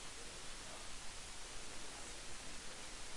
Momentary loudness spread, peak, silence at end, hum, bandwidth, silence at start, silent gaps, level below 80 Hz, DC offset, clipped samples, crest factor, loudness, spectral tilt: 1 LU; -36 dBFS; 0 s; none; 11.5 kHz; 0 s; none; -58 dBFS; under 0.1%; under 0.1%; 12 dB; -50 LUFS; -1.5 dB/octave